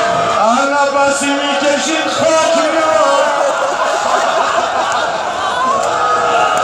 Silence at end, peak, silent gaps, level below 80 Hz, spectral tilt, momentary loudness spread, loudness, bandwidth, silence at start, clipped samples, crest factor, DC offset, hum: 0 s; 0 dBFS; none; -52 dBFS; -2 dB/octave; 3 LU; -13 LUFS; 13.5 kHz; 0 s; under 0.1%; 12 dB; under 0.1%; none